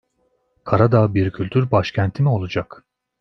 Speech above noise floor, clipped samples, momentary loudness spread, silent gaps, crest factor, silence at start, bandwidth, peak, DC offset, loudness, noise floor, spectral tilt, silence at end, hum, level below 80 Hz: 49 dB; under 0.1%; 11 LU; none; 18 dB; 0.65 s; 6.2 kHz; -2 dBFS; under 0.1%; -19 LUFS; -66 dBFS; -8.5 dB/octave; 0.55 s; none; -50 dBFS